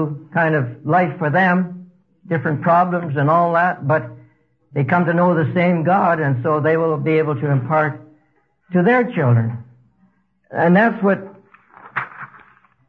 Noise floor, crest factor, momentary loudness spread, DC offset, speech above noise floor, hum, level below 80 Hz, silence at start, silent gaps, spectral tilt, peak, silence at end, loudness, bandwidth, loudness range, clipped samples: -62 dBFS; 14 dB; 12 LU; under 0.1%; 45 dB; none; -64 dBFS; 0 s; none; -10 dB/octave; -4 dBFS; 0.6 s; -18 LUFS; 5 kHz; 3 LU; under 0.1%